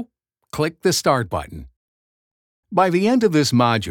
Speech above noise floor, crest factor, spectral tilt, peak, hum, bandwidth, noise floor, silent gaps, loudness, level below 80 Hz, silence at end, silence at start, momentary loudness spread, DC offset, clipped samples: 39 dB; 18 dB; -5 dB/octave; -2 dBFS; none; 18.5 kHz; -57 dBFS; 1.76-2.63 s; -19 LUFS; -50 dBFS; 0 s; 0 s; 18 LU; under 0.1%; under 0.1%